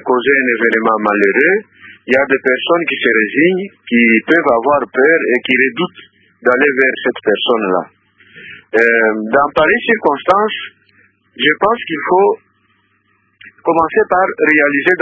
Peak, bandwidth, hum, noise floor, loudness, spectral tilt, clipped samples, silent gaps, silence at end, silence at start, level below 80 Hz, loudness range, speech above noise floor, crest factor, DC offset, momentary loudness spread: 0 dBFS; 8 kHz; none; -58 dBFS; -13 LUFS; -6.5 dB/octave; under 0.1%; none; 0 s; 0.05 s; -54 dBFS; 4 LU; 46 dB; 14 dB; under 0.1%; 8 LU